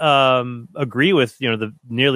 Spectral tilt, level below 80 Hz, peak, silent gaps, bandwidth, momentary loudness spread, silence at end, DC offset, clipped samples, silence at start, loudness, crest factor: -6 dB/octave; -66 dBFS; -2 dBFS; none; 15 kHz; 12 LU; 0 s; under 0.1%; under 0.1%; 0 s; -18 LUFS; 16 dB